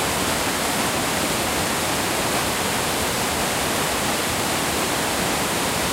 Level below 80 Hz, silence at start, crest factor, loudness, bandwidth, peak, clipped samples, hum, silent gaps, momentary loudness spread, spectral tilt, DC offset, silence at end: -42 dBFS; 0 s; 14 dB; -21 LUFS; 16 kHz; -8 dBFS; under 0.1%; none; none; 0 LU; -2.5 dB/octave; under 0.1%; 0 s